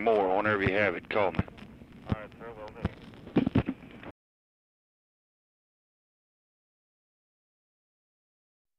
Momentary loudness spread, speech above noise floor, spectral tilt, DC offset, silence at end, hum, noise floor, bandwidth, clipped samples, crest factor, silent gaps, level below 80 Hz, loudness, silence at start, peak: 22 LU; over 63 dB; -8.5 dB/octave; under 0.1%; 4.7 s; none; under -90 dBFS; 10 kHz; under 0.1%; 22 dB; none; -52 dBFS; -30 LUFS; 0 s; -10 dBFS